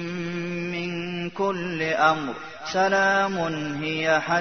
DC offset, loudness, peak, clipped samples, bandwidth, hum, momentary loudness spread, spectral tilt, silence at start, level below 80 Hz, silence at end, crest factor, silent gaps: 0.3%; -24 LUFS; -6 dBFS; under 0.1%; 6.6 kHz; none; 9 LU; -5 dB/octave; 0 s; -60 dBFS; 0 s; 18 dB; none